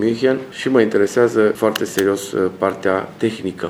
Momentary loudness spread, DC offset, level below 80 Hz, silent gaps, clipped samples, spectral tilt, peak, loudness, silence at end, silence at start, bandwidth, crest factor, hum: 6 LU; under 0.1%; -62 dBFS; none; under 0.1%; -5 dB/octave; -2 dBFS; -18 LUFS; 0 s; 0 s; 18 kHz; 16 dB; none